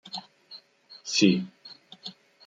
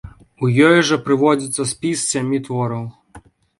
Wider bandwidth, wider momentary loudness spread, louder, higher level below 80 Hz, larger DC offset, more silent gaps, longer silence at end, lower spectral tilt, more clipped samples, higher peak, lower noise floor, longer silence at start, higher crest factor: second, 9.2 kHz vs 11.5 kHz; first, 25 LU vs 11 LU; second, -24 LUFS vs -17 LUFS; second, -74 dBFS vs -52 dBFS; neither; neither; about the same, 0.35 s vs 0.4 s; about the same, -4 dB/octave vs -4.5 dB/octave; neither; second, -6 dBFS vs 0 dBFS; first, -53 dBFS vs -45 dBFS; about the same, 0.05 s vs 0.05 s; first, 24 dB vs 18 dB